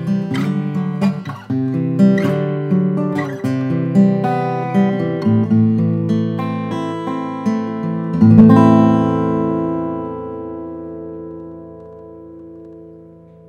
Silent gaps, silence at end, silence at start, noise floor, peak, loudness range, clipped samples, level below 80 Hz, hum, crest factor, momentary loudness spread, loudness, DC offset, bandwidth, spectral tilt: none; 0.4 s; 0 s; -41 dBFS; 0 dBFS; 11 LU; under 0.1%; -54 dBFS; none; 16 dB; 21 LU; -16 LUFS; under 0.1%; 8 kHz; -9.5 dB/octave